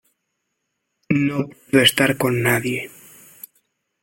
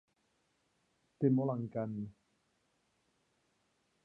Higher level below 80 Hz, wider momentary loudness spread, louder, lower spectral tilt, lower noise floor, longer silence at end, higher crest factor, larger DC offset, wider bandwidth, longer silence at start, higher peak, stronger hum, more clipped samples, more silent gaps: first, -56 dBFS vs -78 dBFS; about the same, 13 LU vs 13 LU; first, -19 LUFS vs -35 LUFS; second, -4.5 dB/octave vs -11.5 dB/octave; about the same, -76 dBFS vs -78 dBFS; second, 1.15 s vs 1.95 s; about the same, 20 dB vs 22 dB; neither; first, 17 kHz vs 4 kHz; about the same, 1.1 s vs 1.2 s; first, -2 dBFS vs -18 dBFS; neither; neither; neither